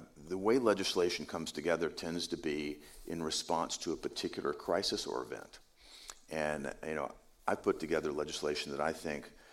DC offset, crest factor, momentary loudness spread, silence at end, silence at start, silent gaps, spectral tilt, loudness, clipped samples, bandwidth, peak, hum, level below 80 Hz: under 0.1%; 22 dB; 12 LU; 0 s; 0 s; none; -3.5 dB/octave; -36 LUFS; under 0.1%; 16.5 kHz; -16 dBFS; none; -64 dBFS